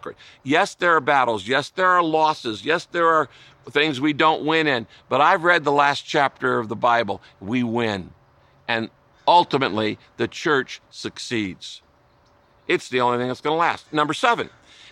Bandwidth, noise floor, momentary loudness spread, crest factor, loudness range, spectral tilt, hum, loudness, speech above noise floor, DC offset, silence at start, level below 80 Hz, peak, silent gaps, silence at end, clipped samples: 12 kHz; -57 dBFS; 13 LU; 18 dB; 6 LU; -4.5 dB/octave; none; -21 LUFS; 36 dB; under 0.1%; 0.05 s; -64 dBFS; -4 dBFS; none; 0.45 s; under 0.1%